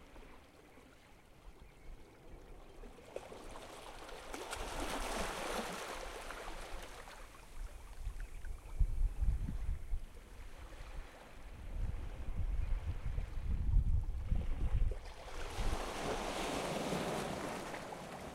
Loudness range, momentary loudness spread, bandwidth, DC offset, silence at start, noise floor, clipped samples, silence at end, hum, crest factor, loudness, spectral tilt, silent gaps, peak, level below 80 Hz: 11 LU; 20 LU; 15.5 kHz; under 0.1%; 0 s; -60 dBFS; under 0.1%; 0 s; none; 20 dB; -43 LUFS; -5 dB/octave; none; -20 dBFS; -42 dBFS